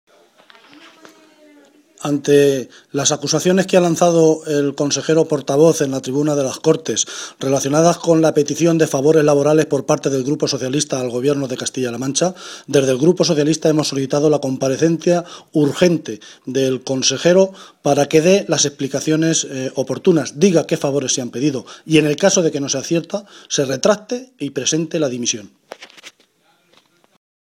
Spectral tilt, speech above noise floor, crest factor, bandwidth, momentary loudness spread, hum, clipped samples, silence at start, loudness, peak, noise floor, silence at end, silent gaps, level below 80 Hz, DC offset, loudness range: -4.5 dB/octave; 42 dB; 16 dB; 16 kHz; 9 LU; none; under 0.1%; 2 s; -17 LUFS; 0 dBFS; -59 dBFS; 1.45 s; none; -60 dBFS; under 0.1%; 4 LU